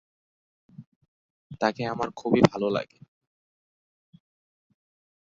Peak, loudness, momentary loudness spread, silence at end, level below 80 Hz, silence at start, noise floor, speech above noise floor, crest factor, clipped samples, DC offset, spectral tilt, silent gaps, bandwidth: -2 dBFS; -26 LUFS; 10 LU; 2.4 s; -62 dBFS; 0.8 s; under -90 dBFS; over 65 dB; 28 dB; under 0.1%; under 0.1%; -6.5 dB/octave; 0.87-1.01 s, 1.08-1.50 s; 7.8 kHz